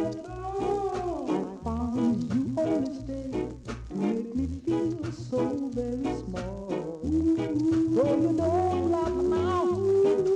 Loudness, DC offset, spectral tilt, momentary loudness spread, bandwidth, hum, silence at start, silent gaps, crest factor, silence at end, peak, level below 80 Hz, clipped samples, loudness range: -28 LUFS; under 0.1%; -8 dB/octave; 10 LU; 9.8 kHz; none; 0 s; none; 14 dB; 0 s; -14 dBFS; -46 dBFS; under 0.1%; 5 LU